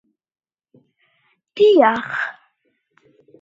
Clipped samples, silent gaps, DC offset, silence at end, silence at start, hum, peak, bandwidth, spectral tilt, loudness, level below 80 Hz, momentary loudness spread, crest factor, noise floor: under 0.1%; none; under 0.1%; 1.1 s; 1.55 s; none; 0 dBFS; 7.6 kHz; -5.5 dB/octave; -16 LUFS; -74 dBFS; 16 LU; 20 dB; -69 dBFS